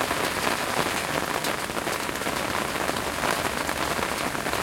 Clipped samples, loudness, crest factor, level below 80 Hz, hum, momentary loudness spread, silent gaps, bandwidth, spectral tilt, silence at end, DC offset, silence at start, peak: under 0.1%; -26 LUFS; 22 dB; -48 dBFS; none; 2 LU; none; 17 kHz; -2.5 dB/octave; 0 s; under 0.1%; 0 s; -6 dBFS